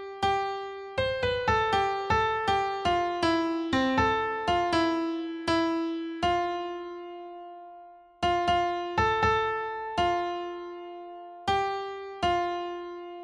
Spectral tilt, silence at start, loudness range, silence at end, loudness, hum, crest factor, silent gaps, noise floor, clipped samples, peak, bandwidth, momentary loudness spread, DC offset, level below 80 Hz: -5 dB/octave; 0 s; 4 LU; 0 s; -28 LUFS; none; 16 dB; none; -50 dBFS; under 0.1%; -12 dBFS; 11 kHz; 15 LU; under 0.1%; -48 dBFS